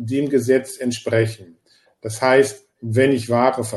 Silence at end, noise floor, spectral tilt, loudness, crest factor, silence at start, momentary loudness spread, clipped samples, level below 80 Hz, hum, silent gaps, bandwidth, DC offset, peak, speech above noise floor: 0 s; -58 dBFS; -5.5 dB/octave; -19 LUFS; 18 dB; 0 s; 15 LU; under 0.1%; -62 dBFS; none; none; 12.5 kHz; under 0.1%; -2 dBFS; 39 dB